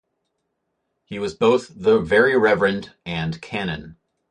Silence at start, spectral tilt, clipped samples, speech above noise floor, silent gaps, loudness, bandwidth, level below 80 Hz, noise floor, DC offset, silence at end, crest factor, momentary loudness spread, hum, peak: 1.1 s; -6 dB/octave; under 0.1%; 55 dB; none; -20 LUFS; 10 kHz; -50 dBFS; -75 dBFS; under 0.1%; 0.4 s; 18 dB; 14 LU; none; -4 dBFS